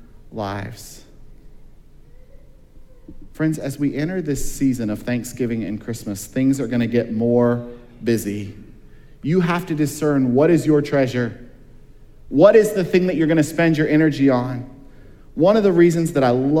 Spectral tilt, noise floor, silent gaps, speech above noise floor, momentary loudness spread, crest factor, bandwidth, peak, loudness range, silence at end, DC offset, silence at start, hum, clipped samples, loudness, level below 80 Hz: -6.5 dB/octave; -43 dBFS; none; 25 dB; 14 LU; 18 dB; 16.5 kHz; 0 dBFS; 10 LU; 0 s; under 0.1%; 0 s; none; under 0.1%; -19 LUFS; -42 dBFS